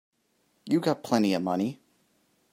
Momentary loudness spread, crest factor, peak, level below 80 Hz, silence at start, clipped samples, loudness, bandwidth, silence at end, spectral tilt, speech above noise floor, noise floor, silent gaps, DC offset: 7 LU; 22 dB; -8 dBFS; -76 dBFS; 0.65 s; under 0.1%; -27 LUFS; 16 kHz; 0.8 s; -6 dB/octave; 45 dB; -71 dBFS; none; under 0.1%